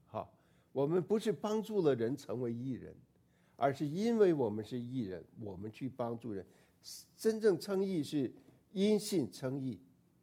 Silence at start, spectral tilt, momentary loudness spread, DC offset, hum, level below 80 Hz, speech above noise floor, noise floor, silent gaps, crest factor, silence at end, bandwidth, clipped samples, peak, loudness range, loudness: 0.15 s; -6.5 dB/octave; 15 LU; under 0.1%; none; -76 dBFS; 35 dB; -70 dBFS; none; 18 dB; 0.45 s; 16.5 kHz; under 0.1%; -18 dBFS; 3 LU; -36 LUFS